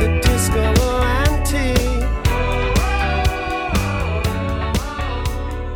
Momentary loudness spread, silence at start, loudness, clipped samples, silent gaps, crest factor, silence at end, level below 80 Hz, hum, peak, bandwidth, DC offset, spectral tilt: 7 LU; 0 s; -19 LUFS; under 0.1%; none; 14 dB; 0 s; -20 dBFS; none; -4 dBFS; 18 kHz; under 0.1%; -5 dB/octave